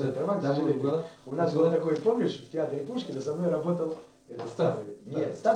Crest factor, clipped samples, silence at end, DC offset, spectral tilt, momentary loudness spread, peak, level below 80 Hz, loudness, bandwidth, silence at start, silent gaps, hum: 18 dB; under 0.1%; 0 s; under 0.1%; -7.5 dB/octave; 11 LU; -12 dBFS; -72 dBFS; -29 LUFS; 10 kHz; 0 s; none; none